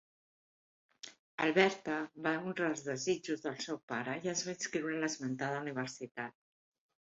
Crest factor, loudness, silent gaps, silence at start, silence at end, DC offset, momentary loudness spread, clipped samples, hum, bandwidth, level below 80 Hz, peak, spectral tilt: 22 dB; -36 LUFS; 1.19-1.38 s, 3.83-3.88 s; 1.05 s; 0.7 s; under 0.1%; 13 LU; under 0.1%; none; 8 kHz; -80 dBFS; -14 dBFS; -3.5 dB/octave